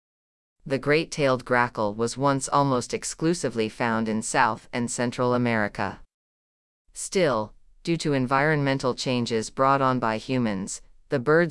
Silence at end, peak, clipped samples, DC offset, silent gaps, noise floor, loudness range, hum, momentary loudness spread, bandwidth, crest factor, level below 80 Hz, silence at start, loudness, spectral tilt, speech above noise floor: 0 s; -6 dBFS; under 0.1%; under 0.1%; 6.14-6.85 s; under -90 dBFS; 3 LU; none; 8 LU; 12 kHz; 18 dB; -54 dBFS; 0.65 s; -25 LUFS; -5 dB/octave; over 66 dB